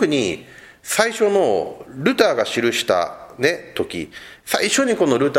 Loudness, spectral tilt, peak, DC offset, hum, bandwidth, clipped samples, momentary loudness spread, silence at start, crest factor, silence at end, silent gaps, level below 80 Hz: -19 LUFS; -3.5 dB/octave; 0 dBFS; under 0.1%; none; 16.5 kHz; under 0.1%; 13 LU; 0 s; 20 dB; 0 s; none; -58 dBFS